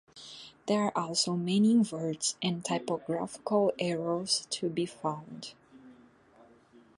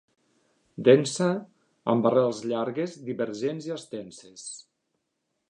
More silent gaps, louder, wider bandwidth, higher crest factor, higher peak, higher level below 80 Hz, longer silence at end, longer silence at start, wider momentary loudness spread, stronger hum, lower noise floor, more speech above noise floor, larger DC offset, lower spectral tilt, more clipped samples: neither; second, -30 LUFS vs -26 LUFS; about the same, 11.5 kHz vs 11 kHz; second, 16 dB vs 24 dB; second, -16 dBFS vs -4 dBFS; about the same, -74 dBFS vs -76 dBFS; first, 1.05 s vs 0.9 s; second, 0.15 s vs 0.8 s; second, 17 LU vs 20 LU; neither; second, -60 dBFS vs -79 dBFS; second, 29 dB vs 53 dB; neither; about the same, -4.5 dB/octave vs -5.5 dB/octave; neither